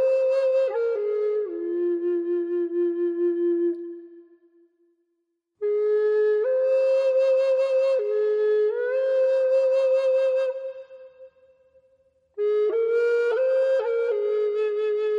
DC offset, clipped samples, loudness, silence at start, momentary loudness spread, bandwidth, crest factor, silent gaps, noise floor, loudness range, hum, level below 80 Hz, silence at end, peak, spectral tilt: under 0.1%; under 0.1%; -23 LUFS; 0 s; 7 LU; 7.2 kHz; 8 dB; none; -76 dBFS; 5 LU; none; -84 dBFS; 0 s; -14 dBFS; -4 dB/octave